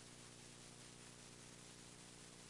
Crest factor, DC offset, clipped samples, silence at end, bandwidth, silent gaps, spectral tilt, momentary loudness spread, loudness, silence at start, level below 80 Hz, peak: 14 dB; under 0.1%; under 0.1%; 0 s; 12 kHz; none; -2.5 dB/octave; 0 LU; -58 LUFS; 0 s; -78 dBFS; -46 dBFS